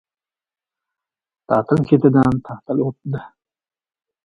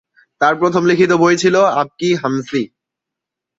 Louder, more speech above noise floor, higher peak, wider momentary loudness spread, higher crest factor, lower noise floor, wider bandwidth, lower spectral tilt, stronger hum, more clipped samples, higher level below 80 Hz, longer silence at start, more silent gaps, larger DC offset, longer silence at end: second, -18 LUFS vs -14 LUFS; first, over 73 dB vs 69 dB; about the same, 0 dBFS vs -2 dBFS; first, 14 LU vs 9 LU; first, 20 dB vs 14 dB; first, under -90 dBFS vs -83 dBFS; about the same, 7.2 kHz vs 7.8 kHz; first, -10 dB/octave vs -5.5 dB/octave; neither; neither; first, -52 dBFS vs -60 dBFS; first, 1.5 s vs 0.4 s; neither; neither; about the same, 0.95 s vs 0.95 s